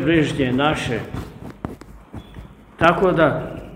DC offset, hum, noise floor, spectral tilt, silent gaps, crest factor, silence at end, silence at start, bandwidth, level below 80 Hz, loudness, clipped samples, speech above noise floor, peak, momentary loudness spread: under 0.1%; none; -40 dBFS; -6.5 dB/octave; none; 20 dB; 0 s; 0 s; 15.5 kHz; -40 dBFS; -19 LUFS; under 0.1%; 22 dB; 0 dBFS; 23 LU